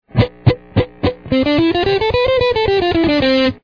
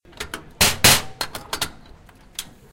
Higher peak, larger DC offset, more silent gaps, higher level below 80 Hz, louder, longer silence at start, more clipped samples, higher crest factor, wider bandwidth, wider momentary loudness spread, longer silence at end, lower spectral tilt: about the same, 0 dBFS vs 0 dBFS; first, 0.3% vs under 0.1%; neither; first, -34 dBFS vs -42 dBFS; first, -15 LUFS vs -18 LUFS; about the same, 0.15 s vs 0.2 s; neither; second, 14 dB vs 22 dB; second, 5.4 kHz vs 17 kHz; second, 5 LU vs 20 LU; second, 0.1 s vs 0.25 s; first, -8 dB/octave vs -1.5 dB/octave